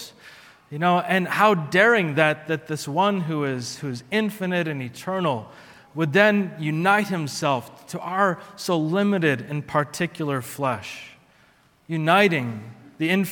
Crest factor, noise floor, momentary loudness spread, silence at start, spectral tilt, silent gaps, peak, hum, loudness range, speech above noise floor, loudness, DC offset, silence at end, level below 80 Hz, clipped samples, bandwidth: 22 dB; -58 dBFS; 13 LU; 0 s; -5.5 dB/octave; none; -2 dBFS; none; 5 LU; 36 dB; -22 LUFS; under 0.1%; 0 s; -68 dBFS; under 0.1%; 18 kHz